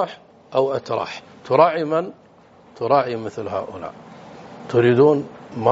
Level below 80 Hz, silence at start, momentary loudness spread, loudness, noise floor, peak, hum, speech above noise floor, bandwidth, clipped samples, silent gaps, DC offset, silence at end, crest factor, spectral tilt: -64 dBFS; 0 s; 21 LU; -20 LUFS; -49 dBFS; -2 dBFS; none; 30 dB; 7.8 kHz; under 0.1%; none; under 0.1%; 0 s; 18 dB; -5.5 dB/octave